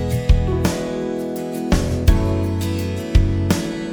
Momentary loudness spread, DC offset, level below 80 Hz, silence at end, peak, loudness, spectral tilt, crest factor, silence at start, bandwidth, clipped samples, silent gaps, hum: 7 LU; under 0.1%; -22 dBFS; 0 s; -2 dBFS; -20 LUFS; -6.5 dB/octave; 16 dB; 0 s; over 20 kHz; under 0.1%; none; none